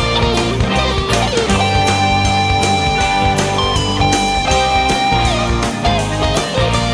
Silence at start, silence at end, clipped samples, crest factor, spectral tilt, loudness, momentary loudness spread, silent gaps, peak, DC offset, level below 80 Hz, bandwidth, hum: 0 s; 0 s; under 0.1%; 12 dB; -4 dB/octave; -14 LUFS; 3 LU; none; -2 dBFS; under 0.1%; -24 dBFS; 11 kHz; none